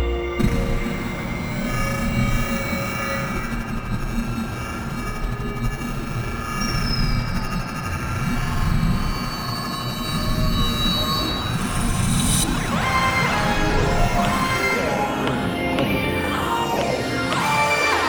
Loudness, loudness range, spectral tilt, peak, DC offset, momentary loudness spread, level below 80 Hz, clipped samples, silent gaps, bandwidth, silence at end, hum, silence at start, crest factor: -22 LUFS; 6 LU; -4.5 dB/octave; -6 dBFS; under 0.1%; 8 LU; -28 dBFS; under 0.1%; none; over 20 kHz; 0 s; none; 0 s; 16 dB